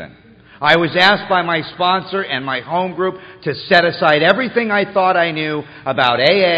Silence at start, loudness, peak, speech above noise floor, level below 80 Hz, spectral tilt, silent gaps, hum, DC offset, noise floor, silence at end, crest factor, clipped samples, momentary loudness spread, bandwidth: 0 s; -15 LUFS; 0 dBFS; 28 dB; -56 dBFS; -6 dB/octave; none; none; under 0.1%; -44 dBFS; 0 s; 16 dB; under 0.1%; 10 LU; 8.2 kHz